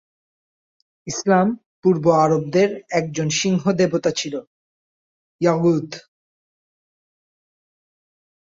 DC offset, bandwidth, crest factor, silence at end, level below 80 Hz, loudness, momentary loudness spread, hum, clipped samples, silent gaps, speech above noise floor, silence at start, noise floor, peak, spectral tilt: under 0.1%; 7.8 kHz; 18 dB; 2.45 s; -62 dBFS; -19 LUFS; 13 LU; none; under 0.1%; 1.66-1.83 s, 4.47-5.39 s; over 71 dB; 1.05 s; under -90 dBFS; -4 dBFS; -5.5 dB/octave